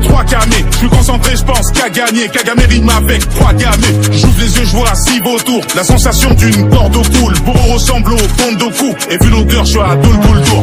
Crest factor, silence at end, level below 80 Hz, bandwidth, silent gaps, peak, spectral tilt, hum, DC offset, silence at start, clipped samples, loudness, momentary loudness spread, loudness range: 8 dB; 0 s; -12 dBFS; 16.5 kHz; none; 0 dBFS; -4.5 dB/octave; none; under 0.1%; 0 s; 2%; -9 LUFS; 4 LU; 1 LU